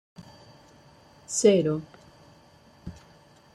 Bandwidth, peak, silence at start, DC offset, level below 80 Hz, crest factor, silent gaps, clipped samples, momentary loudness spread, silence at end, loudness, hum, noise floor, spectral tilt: 13 kHz; -8 dBFS; 0.2 s; under 0.1%; -62 dBFS; 22 dB; none; under 0.1%; 27 LU; 0.6 s; -24 LUFS; none; -56 dBFS; -5 dB/octave